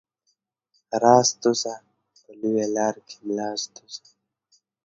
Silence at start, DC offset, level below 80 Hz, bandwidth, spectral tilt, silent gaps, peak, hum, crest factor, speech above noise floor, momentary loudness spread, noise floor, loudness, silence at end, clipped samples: 0.9 s; under 0.1%; -74 dBFS; 8 kHz; -3.5 dB/octave; none; -2 dBFS; none; 24 dB; 51 dB; 22 LU; -74 dBFS; -23 LUFS; 0.9 s; under 0.1%